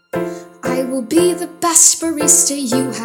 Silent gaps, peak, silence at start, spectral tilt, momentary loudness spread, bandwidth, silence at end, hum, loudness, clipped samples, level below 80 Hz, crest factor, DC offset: none; 0 dBFS; 0.15 s; -2.5 dB/octave; 15 LU; over 20 kHz; 0 s; none; -13 LUFS; under 0.1%; -58 dBFS; 16 dB; under 0.1%